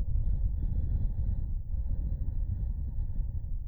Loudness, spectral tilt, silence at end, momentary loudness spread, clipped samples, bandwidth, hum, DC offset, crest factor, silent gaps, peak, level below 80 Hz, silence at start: -35 LUFS; -12.5 dB/octave; 0 s; 4 LU; under 0.1%; 1 kHz; none; under 0.1%; 12 dB; none; -18 dBFS; -30 dBFS; 0 s